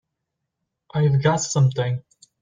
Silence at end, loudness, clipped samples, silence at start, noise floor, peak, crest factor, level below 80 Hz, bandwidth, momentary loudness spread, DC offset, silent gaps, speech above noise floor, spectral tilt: 0.4 s; -21 LUFS; under 0.1%; 0.95 s; -80 dBFS; -4 dBFS; 18 dB; -58 dBFS; 9.4 kHz; 10 LU; under 0.1%; none; 61 dB; -5.5 dB/octave